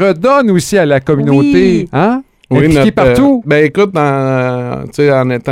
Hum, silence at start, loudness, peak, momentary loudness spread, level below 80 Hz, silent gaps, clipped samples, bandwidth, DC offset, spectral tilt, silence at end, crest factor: none; 0 s; -10 LUFS; 0 dBFS; 6 LU; -36 dBFS; none; 0.9%; 15.5 kHz; 0.2%; -7 dB/octave; 0 s; 10 dB